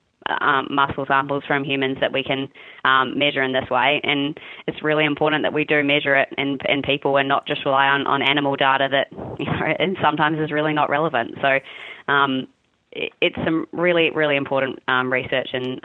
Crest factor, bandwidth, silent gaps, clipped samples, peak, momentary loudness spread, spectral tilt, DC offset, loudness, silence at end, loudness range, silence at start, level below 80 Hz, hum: 18 dB; 4.3 kHz; none; under 0.1%; -4 dBFS; 9 LU; -7.5 dB/octave; under 0.1%; -20 LUFS; 0.05 s; 3 LU; 0.3 s; -58 dBFS; none